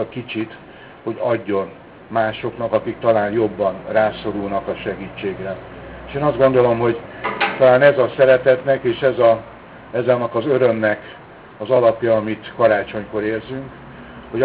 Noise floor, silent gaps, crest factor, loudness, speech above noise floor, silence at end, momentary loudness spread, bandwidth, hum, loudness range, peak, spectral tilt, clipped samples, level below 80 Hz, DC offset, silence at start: -37 dBFS; none; 16 dB; -18 LUFS; 19 dB; 0 s; 17 LU; 4 kHz; none; 6 LU; -2 dBFS; -10 dB/octave; under 0.1%; -50 dBFS; under 0.1%; 0 s